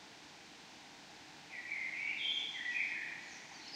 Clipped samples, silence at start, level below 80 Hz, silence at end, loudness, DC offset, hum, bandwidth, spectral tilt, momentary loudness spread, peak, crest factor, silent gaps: under 0.1%; 0 s; -84 dBFS; 0 s; -39 LUFS; under 0.1%; none; 15.5 kHz; 0 dB/octave; 18 LU; -24 dBFS; 18 dB; none